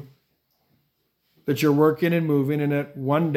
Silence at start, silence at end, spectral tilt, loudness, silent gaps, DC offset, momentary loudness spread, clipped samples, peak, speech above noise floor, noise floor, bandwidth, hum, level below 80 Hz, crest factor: 0 s; 0 s; -7.5 dB/octave; -22 LUFS; none; under 0.1%; 8 LU; under 0.1%; -6 dBFS; 50 dB; -71 dBFS; 16.5 kHz; none; -70 dBFS; 18 dB